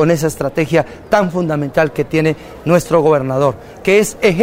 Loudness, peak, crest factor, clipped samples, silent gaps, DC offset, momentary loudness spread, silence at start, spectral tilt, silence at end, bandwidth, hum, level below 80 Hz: -15 LUFS; 0 dBFS; 14 dB; under 0.1%; none; under 0.1%; 5 LU; 0 s; -6 dB/octave; 0 s; 16 kHz; none; -42 dBFS